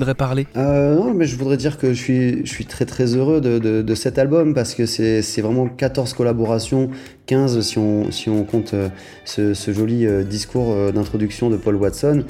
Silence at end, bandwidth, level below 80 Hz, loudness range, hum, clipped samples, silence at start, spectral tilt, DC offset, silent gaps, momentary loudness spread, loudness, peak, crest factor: 0 s; 15 kHz; -42 dBFS; 2 LU; none; under 0.1%; 0 s; -6.5 dB/octave; under 0.1%; none; 6 LU; -19 LUFS; -4 dBFS; 14 dB